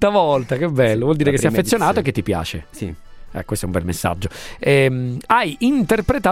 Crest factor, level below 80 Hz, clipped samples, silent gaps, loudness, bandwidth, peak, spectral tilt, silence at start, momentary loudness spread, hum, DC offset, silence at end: 18 dB; -38 dBFS; under 0.1%; none; -18 LUFS; 16.5 kHz; 0 dBFS; -5.5 dB/octave; 0 s; 13 LU; none; under 0.1%; 0 s